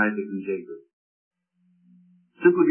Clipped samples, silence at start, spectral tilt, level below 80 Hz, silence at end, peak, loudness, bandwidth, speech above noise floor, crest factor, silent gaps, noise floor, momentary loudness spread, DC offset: under 0.1%; 0 s; -11.5 dB/octave; -84 dBFS; 0 s; -4 dBFS; -24 LUFS; 3.2 kHz; 44 dB; 22 dB; 0.93-1.31 s; -66 dBFS; 22 LU; under 0.1%